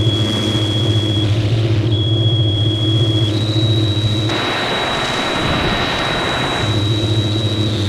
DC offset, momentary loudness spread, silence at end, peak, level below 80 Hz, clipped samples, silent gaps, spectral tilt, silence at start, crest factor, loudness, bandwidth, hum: under 0.1%; 2 LU; 0 s; -4 dBFS; -36 dBFS; under 0.1%; none; -5.5 dB/octave; 0 s; 12 dB; -16 LUFS; 12 kHz; none